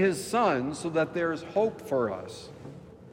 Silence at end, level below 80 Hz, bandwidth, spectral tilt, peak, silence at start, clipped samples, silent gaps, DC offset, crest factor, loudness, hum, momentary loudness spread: 0 s; -64 dBFS; 16 kHz; -5.5 dB/octave; -14 dBFS; 0 s; under 0.1%; none; under 0.1%; 16 dB; -28 LUFS; none; 19 LU